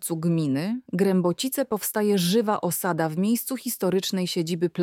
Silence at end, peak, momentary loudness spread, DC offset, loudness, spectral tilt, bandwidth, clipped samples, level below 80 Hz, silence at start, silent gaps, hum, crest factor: 0 s; -10 dBFS; 4 LU; under 0.1%; -25 LUFS; -5 dB/octave; 18 kHz; under 0.1%; -70 dBFS; 0 s; none; none; 14 dB